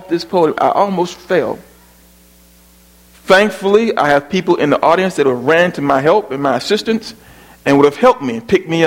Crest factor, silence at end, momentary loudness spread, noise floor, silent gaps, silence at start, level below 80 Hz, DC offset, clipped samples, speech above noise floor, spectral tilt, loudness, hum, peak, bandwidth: 14 dB; 0 s; 8 LU; -46 dBFS; none; 0 s; -50 dBFS; under 0.1%; under 0.1%; 33 dB; -5.5 dB/octave; -14 LUFS; 60 Hz at -45 dBFS; 0 dBFS; 16.5 kHz